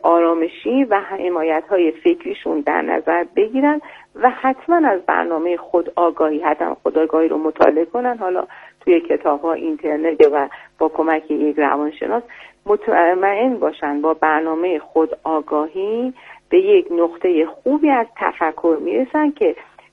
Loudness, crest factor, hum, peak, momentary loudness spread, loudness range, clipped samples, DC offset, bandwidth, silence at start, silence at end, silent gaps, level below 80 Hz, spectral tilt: -18 LUFS; 18 dB; none; 0 dBFS; 7 LU; 1 LU; under 0.1%; under 0.1%; 4.9 kHz; 0.05 s; 0.3 s; none; -60 dBFS; -6.5 dB/octave